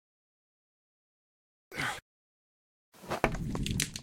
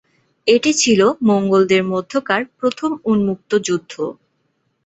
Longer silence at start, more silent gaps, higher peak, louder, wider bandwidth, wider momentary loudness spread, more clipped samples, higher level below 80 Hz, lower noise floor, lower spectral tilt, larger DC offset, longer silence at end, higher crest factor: first, 1.7 s vs 0.45 s; first, 2.02-2.92 s vs none; second, -6 dBFS vs -2 dBFS; second, -35 LUFS vs -17 LUFS; first, 16.5 kHz vs 8.2 kHz; about the same, 11 LU vs 9 LU; neither; first, -48 dBFS vs -58 dBFS; first, under -90 dBFS vs -67 dBFS; about the same, -4 dB/octave vs -4 dB/octave; neither; second, 0 s vs 0.75 s; first, 32 dB vs 16 dB